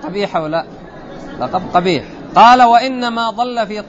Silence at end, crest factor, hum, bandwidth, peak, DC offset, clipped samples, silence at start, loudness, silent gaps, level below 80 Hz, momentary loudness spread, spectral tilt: 0 s; 14 dB; none; 8 kHz; 0 dBFS; under 0.1%; under 0.1%; 0 s; -13 LUFS; none; -44 dBFS; 24 LU; -5 dB/octave